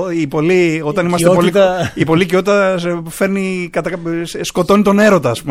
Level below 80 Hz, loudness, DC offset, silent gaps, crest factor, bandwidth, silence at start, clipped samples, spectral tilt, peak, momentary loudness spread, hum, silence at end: -44 dBFS; -14 LUFS; under 0.1%; none; 14 dB; 16 kHz; 0 s; under 0.1%; -6 dB/octave; 0 dBFS; 9 LU; none; 0 s